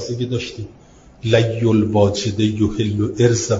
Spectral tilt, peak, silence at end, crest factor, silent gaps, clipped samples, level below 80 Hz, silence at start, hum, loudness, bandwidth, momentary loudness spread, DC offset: -6 dB/octave; 0 dBFS; 0 s; 18 dB; none; under 0.1%; -46 dBFS; 0 s; none; -18 LUFS; 7.8 kHz; 13 LU; under 0.1%